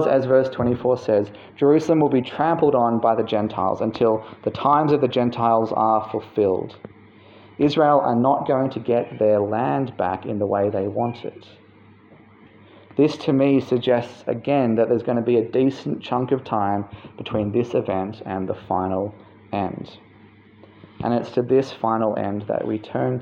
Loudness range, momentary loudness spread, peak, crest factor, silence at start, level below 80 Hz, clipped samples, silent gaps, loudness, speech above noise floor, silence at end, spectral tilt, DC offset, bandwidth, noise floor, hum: 6 LU; 10 LU; -4 dBFS; 16 dB; 0 s; -60 dBFS; under 0.1%; none; -21 LUFS; 29 dB; 0 s; -8 dB/octave; under 0.1%; 7.6 kHz; -50 dBFS; none